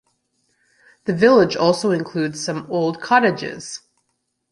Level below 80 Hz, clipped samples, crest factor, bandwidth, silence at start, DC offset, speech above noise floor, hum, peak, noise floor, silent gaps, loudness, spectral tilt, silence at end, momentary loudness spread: -60 dBFS; under 0.1%; 18 dB; 11.5 kHz; 1.05 s; under 0.1%; 54 dB; none; -2 dBFS; -73 dBFS; none; -18 LUFS; -5 dB/octave; 0.75 s; 16 LU